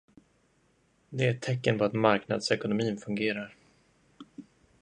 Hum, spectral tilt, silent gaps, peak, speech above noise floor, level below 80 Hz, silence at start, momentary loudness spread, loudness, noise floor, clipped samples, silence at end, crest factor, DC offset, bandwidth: none; -6 dB/octave; none; -8 dBFS; 40 dB; -68 dBFS; 1.1 s; 24 LU; -29 LUFS; -68 dBFS; under 0.1%; 0.4 s; 24 dB; under 0.1%; 10.5 kHz